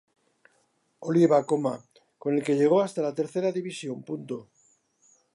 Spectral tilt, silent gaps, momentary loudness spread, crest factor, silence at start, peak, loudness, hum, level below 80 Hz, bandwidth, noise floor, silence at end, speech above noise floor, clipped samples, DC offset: -7 dB/octave; none; 16 LU; 18 dB; 1 s; -10 dBFS; -26 LUFS; none; -80 dBFS; 11.5 kHz; -70 dBFS; 0.95 s; 45 dB; under 0.1%; under 0.1%